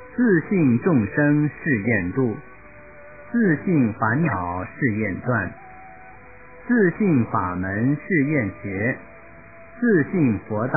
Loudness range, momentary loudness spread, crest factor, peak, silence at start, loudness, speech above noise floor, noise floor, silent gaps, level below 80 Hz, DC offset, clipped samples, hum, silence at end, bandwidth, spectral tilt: 2 LU; 8 LU; 14 dB; -6 dBFS; 0 s; -21 LUFS; 24 dB; -45 dBFS; none; -48 dBFS; 0.4%; under 0.1%; none; 0 s; 2.7 kHz; -15 dB/octave